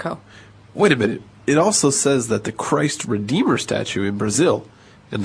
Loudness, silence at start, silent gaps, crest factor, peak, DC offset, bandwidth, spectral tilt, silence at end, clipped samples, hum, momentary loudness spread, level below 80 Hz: -19 LUFS; 0 s; none; 18 dB; -2 dBFS; under 0.1%; 11 kHz; -4 dB/octave; 0 s; under 0.1%; none; 10 LU; -56 dBFS